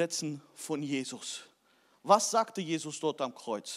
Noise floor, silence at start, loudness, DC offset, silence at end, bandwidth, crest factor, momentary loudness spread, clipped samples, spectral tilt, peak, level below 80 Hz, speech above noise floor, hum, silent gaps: -68 dBFS; 0 s; -32 LUFS; under 0.1%; 0 s; 16 kHz; 24 dB; 15 LU; under 0.1%; -3.5 dB/octave; -10 dBFS; under -90 dBFS; 36 dB; none; none